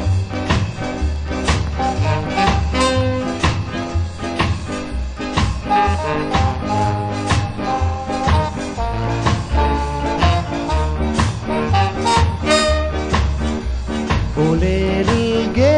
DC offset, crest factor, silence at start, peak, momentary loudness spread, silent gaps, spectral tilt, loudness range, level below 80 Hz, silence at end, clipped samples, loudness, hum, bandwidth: under 0.1%; 16 dB; 0 s; -2 dBFS; 7 LU; none; -5.5 dB/octave; 2 LU; -24 dBFS; 0 s; under 0.1%; -19 LUFS; none; 10.5 kHz